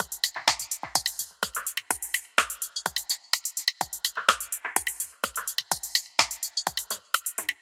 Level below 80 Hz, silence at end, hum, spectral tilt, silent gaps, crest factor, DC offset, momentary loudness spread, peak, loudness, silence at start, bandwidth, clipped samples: -64 dBFS; 0.1 s; none; 1 dB/octave; none; 28 dB; under 0.1%; 6 LU; -2 dBFS; -27 LUFS; 0 s; 17 kHz; under 0.1%